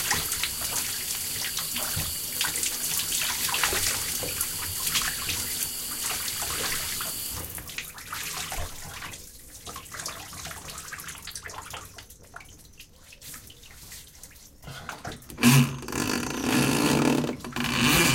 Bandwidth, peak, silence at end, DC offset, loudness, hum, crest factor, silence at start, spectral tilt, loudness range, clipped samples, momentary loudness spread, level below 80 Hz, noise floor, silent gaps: 17 kHz; -6 dBFS; 0 s; under 0.1%; -27 LUFS; none; 22 dB; 0 s; -3 dB/octave; 16 LU; under 0.1%; 20 LU; -48 dBFS; -50 dBFS; none